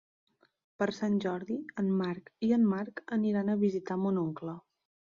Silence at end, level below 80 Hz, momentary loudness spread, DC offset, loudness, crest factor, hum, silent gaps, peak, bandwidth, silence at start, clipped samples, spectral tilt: 0.5 s; -74 dBFS; 9 LU; under 0.1%; -32 LUFS; 16 dB; none; none; -16 dBFS; 7.2 kHz; 0.8 s; under 0.1%; -8 dB/octave